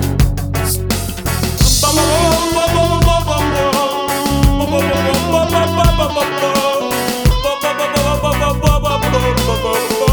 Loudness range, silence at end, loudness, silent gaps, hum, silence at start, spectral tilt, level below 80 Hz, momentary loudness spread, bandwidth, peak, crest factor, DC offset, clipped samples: 2 LU; 0 s; -14 LUFS; none; none; 0 s; -4.5 dB/octave; -20 dBFS; 5 LU; over 20 kHz; 0 dBFS; 12 dB; under 0.1%; under 0.1%